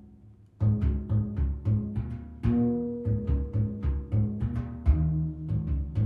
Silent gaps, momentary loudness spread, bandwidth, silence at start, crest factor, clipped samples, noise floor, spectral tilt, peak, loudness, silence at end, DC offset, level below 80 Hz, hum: none; 6 LU; 3.3 kHz; 0 s; 18 dB; under 0.1%; -53 dBFS; -12 dB/octave; -10 dBFS; -29 LUFS; 0 s; under 0.1%; -34 dBFS; none